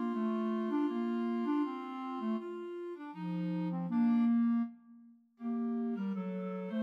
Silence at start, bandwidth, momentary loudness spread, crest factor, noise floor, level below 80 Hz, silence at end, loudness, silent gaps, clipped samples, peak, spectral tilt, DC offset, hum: 0 s; 5.2 kHz; 13 LU; 12 dB; -59 dBFS; under -90 dBFS; 0 s; -35 LUFS; none; under 0.1%; -24 dBFS; -9.5 dB/octave; under 0.1%; none